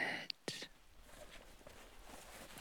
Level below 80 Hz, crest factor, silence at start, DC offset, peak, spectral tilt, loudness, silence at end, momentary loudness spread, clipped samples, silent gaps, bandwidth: -64 dBFS; 28 dB; 0 s; under 0.1%; -22 dBFS; -2 dB/octave; -49 LUFS; 0 s; 15 LU; under 0.1%; none; over 20 kHz